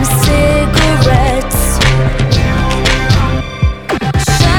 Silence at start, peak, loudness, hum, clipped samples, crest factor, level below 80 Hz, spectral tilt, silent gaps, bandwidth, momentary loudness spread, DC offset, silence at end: 0 s; 0 dBFS; -12 LUFS; none; under 0.1%; 10 dB; -16 dBFS; -5 dB/octave; none; 18.5 kHz; 5 LU; under 0.1%; 0 s